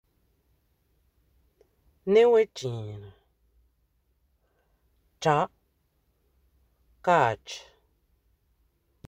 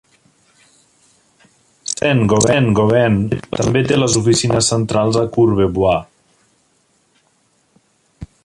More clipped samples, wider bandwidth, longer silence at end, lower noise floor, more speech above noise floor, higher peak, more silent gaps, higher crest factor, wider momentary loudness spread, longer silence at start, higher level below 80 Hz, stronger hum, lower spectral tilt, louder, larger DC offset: neither; second, 8.6 kHz vs 11.5 kHz; first, 1.5 s vs 0.2 s; first, -71 dBFS vs -60 dBFS; about the same, 48 dB vs 46 dB; second, -8 dBFS vs -2 dBFS; neither; first, 22 dB vs 14 dB; first, 21 LU vs 6 LU; first, 2.05 s vs 1.9 s; second, -64 dBFS vs -42 dBFS; neither; about the same, -5.5 dB/octave vs -5 dB/octave; second, -25 LUFS vs -15 LUFS; neither